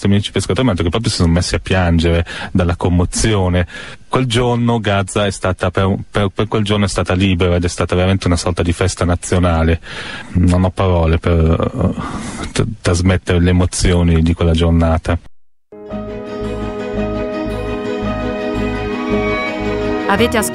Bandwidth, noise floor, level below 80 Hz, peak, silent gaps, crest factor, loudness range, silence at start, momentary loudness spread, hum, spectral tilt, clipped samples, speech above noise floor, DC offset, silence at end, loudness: 14 kHz; -39 dBFS; -26 dBFS; 0 dBFS; none; 14 dB; 5 LU; 0 s; 8 LU; none; -5.5 dB/octave; under 0.1%; 25 dB; under 0.1%; 0 s; -16 LUFS